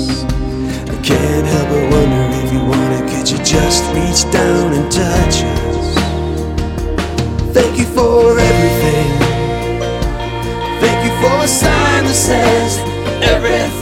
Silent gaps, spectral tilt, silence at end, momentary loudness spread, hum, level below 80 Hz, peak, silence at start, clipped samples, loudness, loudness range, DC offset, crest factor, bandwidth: none; -4.5 dB/octave; 0 s; 8 LU; none; -22 dBFS; 0 dBFS; 0 s; under 0.1%; -13 LUFS; 2 LU; under 0.1%; 12 dB; 17 kHz